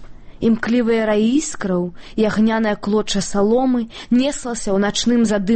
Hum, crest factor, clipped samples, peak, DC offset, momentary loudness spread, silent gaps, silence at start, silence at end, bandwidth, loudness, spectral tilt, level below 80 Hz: none; 12 dB; under 0.1%; -6 dBFS; under 0.1%; 5 LU; none; 0 s; 0 s; 8.8 kHz; -18 LUFS; -5 dB/octave; -40 dBFS